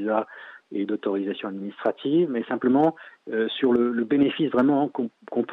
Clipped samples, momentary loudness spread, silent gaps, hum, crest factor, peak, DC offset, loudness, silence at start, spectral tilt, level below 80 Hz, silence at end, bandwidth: under 0.1%; 11 LU; none; none; 14 dB; -10 dBFS; under 0.1%; -24 LUFS; 0 s; -8.5 dB/octave; -68 dBFS; 0 s; 4.2 kHz